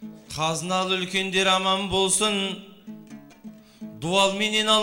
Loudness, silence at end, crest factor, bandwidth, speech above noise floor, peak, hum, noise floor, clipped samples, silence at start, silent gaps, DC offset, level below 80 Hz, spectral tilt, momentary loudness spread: -22 LUFS; 0 s; 18 dB; 16 kHz; 22 dB; -6 dBFS; none; -45 dBFS; under 0.1%; 0 s; none; under 0.1%; -56 dBFS; -2.5 dB/octave; 22 LU